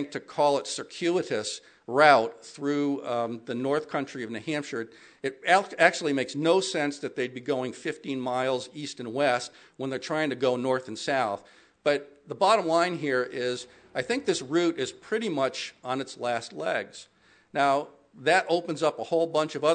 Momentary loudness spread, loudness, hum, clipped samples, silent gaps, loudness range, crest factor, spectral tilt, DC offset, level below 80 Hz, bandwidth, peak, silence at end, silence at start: 12 LU; -27 LUFS; none; under 0.1%; none; 4 LU; 24 dB; -4 dB/octave; under 0.1%; -78 dBFS; 9.4 kHz; -4 dBFS; 0 s; 0 s